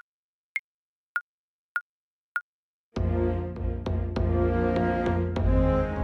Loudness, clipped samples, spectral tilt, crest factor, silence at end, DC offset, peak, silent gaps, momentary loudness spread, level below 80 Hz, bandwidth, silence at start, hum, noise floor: -28 LUFS; under 0.1%; -9 dB/octave; 16 dB; 0 s; under 0.1%; -12 dBFS; 0.59-1.15 s, 1.21-1.75 s, 1.81-2.35 s, 2.41-2.92 s; 10 LU; -34 dBFS; 6.2 kHz; 0.55 s; none; under -90 dBFS